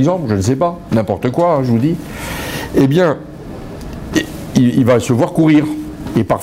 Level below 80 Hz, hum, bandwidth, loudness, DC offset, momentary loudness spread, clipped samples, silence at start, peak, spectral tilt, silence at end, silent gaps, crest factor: -38 dBFS; none; 16 kHz; -15 LUFS; under 0.1%; 13 LU; under 0.1%; 0 s; -2 dBFS; -7 dB/octave; 0 s; none; 14 dB